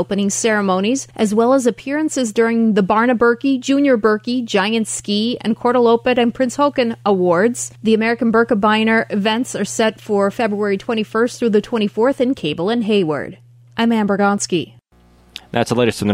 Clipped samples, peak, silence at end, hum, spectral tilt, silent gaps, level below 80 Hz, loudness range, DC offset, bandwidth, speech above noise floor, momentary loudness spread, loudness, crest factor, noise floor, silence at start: under 0.1%; -2 dBFS; 0 s; none; -4.5 dB/octave; none; -54 dBFS; 3 LU; under 0.1%; 15 kHz; 35 dB; 6 LU; -17 LUFS; 14 dB; -51 dBFS; 0 s